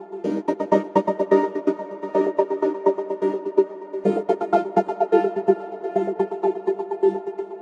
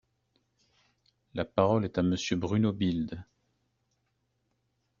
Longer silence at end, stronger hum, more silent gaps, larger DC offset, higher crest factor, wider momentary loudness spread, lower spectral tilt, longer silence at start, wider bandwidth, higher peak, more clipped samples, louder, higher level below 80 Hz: second, 0 s vs 1.75 s; neither; neither; neither; second, 18 dB vs 24 dB; second, 6 LU vs 12 LU; first, -8 dB/octave vs -6.5 dB/octave; second, 0 s vs 1.35 s; about the same, 7.2 kHz vs 7.4 kHz; first, -4 dBFS vs -10 dBFS; neither; first, -23 LUFS vs -29 LUFS; second, -76 dBFS vs -62 dBFS